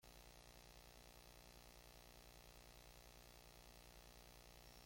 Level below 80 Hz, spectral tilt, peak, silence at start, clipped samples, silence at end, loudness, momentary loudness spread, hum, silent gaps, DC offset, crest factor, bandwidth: -68 dBFS; -3 dB/octave; -46 dBFS; 0 s; under 0.1%; 0 s; -63 LUFS; 0 LU; 60 Hz at -75 dBFS; none; under 0.1%; 16 dB; 16.5 kHz